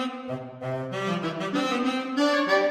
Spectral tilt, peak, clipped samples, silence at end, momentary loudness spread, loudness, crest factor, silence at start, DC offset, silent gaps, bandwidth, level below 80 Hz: -5 dB/octave; -10 dBFS; under 0.1%; 0 s; 12 LU; -27 LUFS; 16 dB; 0 s; under 0.1%; none; 15 kHz; -70 dBFS